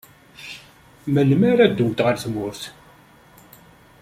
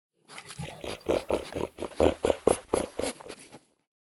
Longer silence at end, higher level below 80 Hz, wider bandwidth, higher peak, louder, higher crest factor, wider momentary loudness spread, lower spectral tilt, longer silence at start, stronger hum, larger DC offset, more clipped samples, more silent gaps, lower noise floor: first, 1.3 s vs 0.45 s; second, -56 dBFS vs -50 dBFS; about the same, 15.5 kHz vs 14.5 kHz; first, -2 dBFS vs -6 dBFS; first, -19 LUFS vs -30 LUFS; second, 20 dB vs 26 dB; about the same, 21 LU vs 19 LU; first, -7 dB/octave vs -4.5 dB/octave; about the same, 0.4 s vs 0.3 s; neither; neither; neither; neither; about the same, -50 dBFS vs -53 dBFS